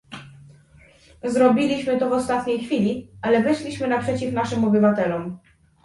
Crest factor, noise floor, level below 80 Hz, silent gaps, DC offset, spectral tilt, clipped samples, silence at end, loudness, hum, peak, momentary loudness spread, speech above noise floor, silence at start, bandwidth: 18 dB; -52 dBFS; -54 dBFS; none; under 0.1%; -6.5 dB/octave; under 0.1%; 0.5 s; -21 LUFS; none; -4 dBFS; 13 LU; 31 dB; 0.1 s; 11.5 kHz